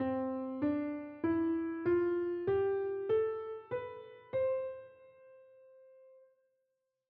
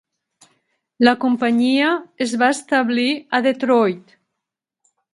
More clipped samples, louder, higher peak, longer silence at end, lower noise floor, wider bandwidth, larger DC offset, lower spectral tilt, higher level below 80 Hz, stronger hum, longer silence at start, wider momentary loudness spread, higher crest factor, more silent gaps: neither; second, -35 LUFS vs -18 LUFS; second, -22 dBFS vs 0 dBFS; about the same, 1.05 s vs 1.15 s; about the same, -84 dBFS vs -83 dBFS; second, 4.3 kHz vs 11.5 kHz; neither; first, -7 dB/octave vs -4 dB/octave; second, -72 dBFS vs -66 dBFS; neither; second, 0 s vs 1 s; first, 9 LU vs 5 LU; second, 14 dB vs 20 dB; neither